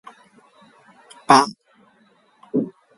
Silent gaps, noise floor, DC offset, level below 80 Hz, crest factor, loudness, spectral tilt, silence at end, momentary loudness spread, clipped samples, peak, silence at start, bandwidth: none; -58 dBFS; under 0.1%; -66 dBFS; 24 dB; -18 LUFS; -4 dB/octave; 0.3 s; 13 LU; under 0.1%; 0 dBFS; 1.3 s; 11.5 kHz